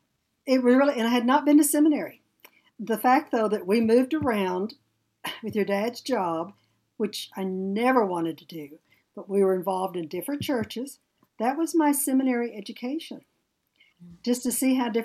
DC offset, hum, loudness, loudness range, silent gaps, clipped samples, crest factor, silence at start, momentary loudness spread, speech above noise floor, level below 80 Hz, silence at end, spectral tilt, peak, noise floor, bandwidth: under 0.1%; none; -25 LUFS; 6 LU; none; under 0.1%; 18 dB; 0.45 s; 16 LU; 49 dB; -70 dBFS; 0 s; -4.5 dB/octave; -6 dBFS; -74 dBFS; 15.5 kHz